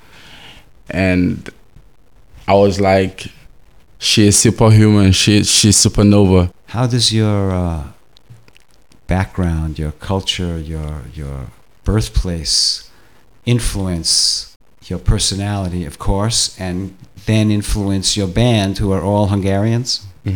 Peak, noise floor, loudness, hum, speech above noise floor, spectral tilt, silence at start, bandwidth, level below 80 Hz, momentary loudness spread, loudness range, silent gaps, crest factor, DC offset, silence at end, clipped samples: 0 dBFS; -51 dBFS; -15 LUFS; none; 37 dB; -4.5 dB/octave; 0.3 s; 18.5 kHz; -30 dBFS; 17 LU; 10 LU; 14.56-14.60 s; 16 dB; 0.6%; 0 s; under 0.1%